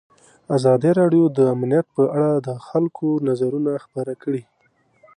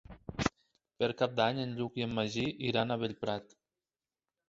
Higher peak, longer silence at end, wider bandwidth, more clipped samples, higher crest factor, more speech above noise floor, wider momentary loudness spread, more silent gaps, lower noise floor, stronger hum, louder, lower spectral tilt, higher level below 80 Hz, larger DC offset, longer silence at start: first, -6 dBFS vs -12 dBFS; second, 0.75 s vs 1.05 s; first, 10.5 kHz vs 8 kHz; neither; second, 14 dB vs 22 dB; second, 43 dB vs over 56 dB; first, 11 LU vs 7 LU; neither; second, -62 dBFS vs under -90 dBFS; neither; first, -20 LUFS vs -34 LUFS; first, -8.5 dB/octave vs -4 dB/octave; second, -68 dBFS vs -60 dBFS; neither; first, 0.5 s vs 0.1 s